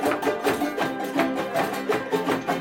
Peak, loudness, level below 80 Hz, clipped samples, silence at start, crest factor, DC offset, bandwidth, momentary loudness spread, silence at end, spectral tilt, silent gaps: -8 dBFS; -25 LUFS; -60 dBFS; under 0.1%; 0 s; 16 dB; under 0.1%; 17 kHz; 2 LU; 0 s; -4.5 dB/octave; none